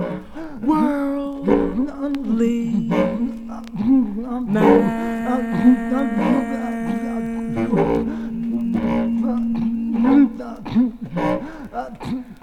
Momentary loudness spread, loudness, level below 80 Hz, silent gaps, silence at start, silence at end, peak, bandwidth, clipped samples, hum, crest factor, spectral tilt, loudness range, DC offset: 12 LU; -20 LUFS; -42 dBFS; none; 0 s; 0.05 s; 0 dBFS; 9.8 kHz; under 0.1%; none; 18 dB; -8 dB/octave; 3 LU; under 0.1%